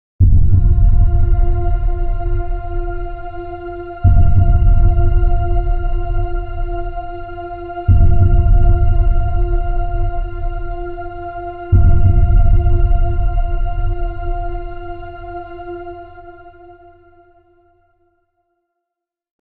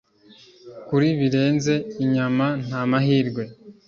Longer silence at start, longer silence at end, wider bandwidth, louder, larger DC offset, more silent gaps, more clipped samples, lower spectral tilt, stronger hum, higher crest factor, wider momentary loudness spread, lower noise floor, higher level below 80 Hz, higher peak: second, 0.2 s vs 0.65 s; first, 2.7 s vs 0.15 s; second, 3 kHz vs 7.4 kHz; first, -18 LUFS vs -22 LUFS; neither; neither; neither; first, -12.5 dB/octave vs -7 dB/octave; neither; about the same, 12 dB vs 16 dB; first, 16 LU vs 8 LU; first, -82 dBFS vs -51 dBFS; first, -16 dBFS vs -60 dBFS; first, 0 dBFS vs -6 dBFS